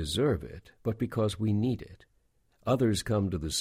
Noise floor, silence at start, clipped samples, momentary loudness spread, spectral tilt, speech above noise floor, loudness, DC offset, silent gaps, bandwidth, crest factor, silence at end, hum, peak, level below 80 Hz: -69 dBFS; 0 s; under 0.1%; 11 LU; -5.5 dB/octave; 40 dB; -30 LUFS; under 0.1%; none; 15.5 kHz; 16 dB; 0 s; none; -14 dBFS; -48 dBFS